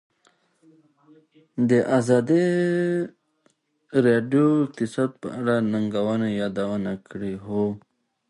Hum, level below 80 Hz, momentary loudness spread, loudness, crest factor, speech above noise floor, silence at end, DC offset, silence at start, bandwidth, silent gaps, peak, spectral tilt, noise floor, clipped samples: none; -62 dBFS; 12 LU; -23 LUFS; 18 dB; 44 dB; 0.5 s; under 0.1%; 1.55 s; 11.5 kHz; none; -6 dBFS; -7.5 dB/octave; -66 dBFS; under 0.1%